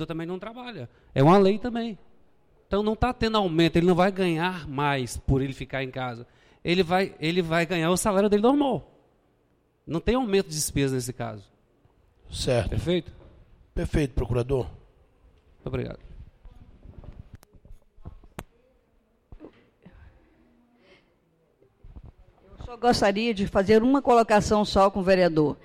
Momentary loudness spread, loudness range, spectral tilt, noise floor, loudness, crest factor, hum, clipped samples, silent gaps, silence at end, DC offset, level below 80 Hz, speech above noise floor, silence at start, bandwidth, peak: 18 LU; 10 LU; -5.5 dB/octave; -67 dBFS; -24 LUFS; 16 dB; none; under 0.1%; none; 0.1 s; under 0.1%; -42 dBFS; 43 dB; 0 s; 16.5 kHz; -10 dBFS